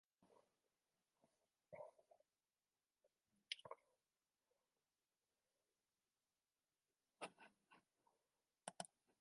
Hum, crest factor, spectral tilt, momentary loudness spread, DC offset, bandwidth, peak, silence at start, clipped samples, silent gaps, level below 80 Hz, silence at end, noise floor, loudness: none; 36 dB; -1.5 dB/octave; 10 LU; under 0.1%; 11 kHz; -30 dBFS; 0.2 s; under 0.1%; none; under -90 dBFS; 0.35 s; under -90 dBFS; -58 LUFS